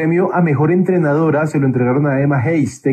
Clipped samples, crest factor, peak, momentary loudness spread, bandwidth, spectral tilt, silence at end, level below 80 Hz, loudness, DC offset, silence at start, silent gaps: under 0.1%; 12 dB; -2 dBFS; 2 LU; 9.2 kHz; -9 dB/octave; 0 s; -58 dBFS; -15 LUFS; under 0.1%; 0 s; none